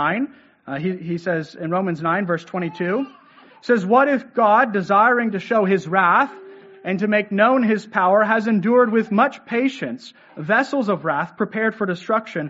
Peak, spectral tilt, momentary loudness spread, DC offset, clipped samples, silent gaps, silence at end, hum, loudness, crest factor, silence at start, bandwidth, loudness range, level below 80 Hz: -2 dBFS; -5 dB/octave; 11 LU; under 0.1%; under 0.1%; none; 0 s; none; -19 LUFS; 18 dB; 0 s; 8 kHz; 5 LU; -70 dBFS